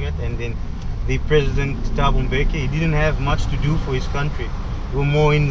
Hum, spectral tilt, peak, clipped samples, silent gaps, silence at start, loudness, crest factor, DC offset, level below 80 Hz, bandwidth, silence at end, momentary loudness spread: none; -7 dB/octave; -2 dBFS; under 0.1%; none; 0 s; -21 LUFS; 16 dB; 0.4%; -24 dBFS; 7.6 kHz; 0 s; 10 LU